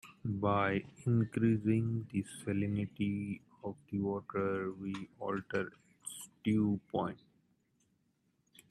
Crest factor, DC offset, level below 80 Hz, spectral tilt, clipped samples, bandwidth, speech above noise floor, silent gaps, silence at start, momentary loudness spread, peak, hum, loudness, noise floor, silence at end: 18 dB; under 0.1%; -70 dBFS; -7 dB/octave; under 0.1%; 13 kHz; 42 dB; none; 0.05 s; 13 LU; -18 dBFS; none; -36 LUFS; -77 dBFS; 1.55 s